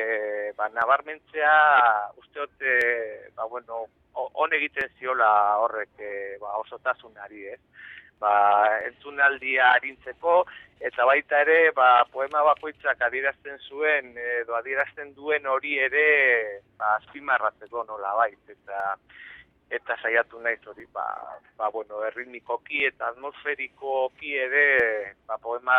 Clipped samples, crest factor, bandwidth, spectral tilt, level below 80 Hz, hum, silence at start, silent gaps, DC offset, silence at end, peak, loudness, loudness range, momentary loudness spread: under 0.1%; 18 dB; 5.2 kHz; -4.5 dB/octave; -68 dBFS; none; 0 s; none; under 0.1%; 0 s; -6 dBFS; -24 LUFS; 8 LU; 17 LU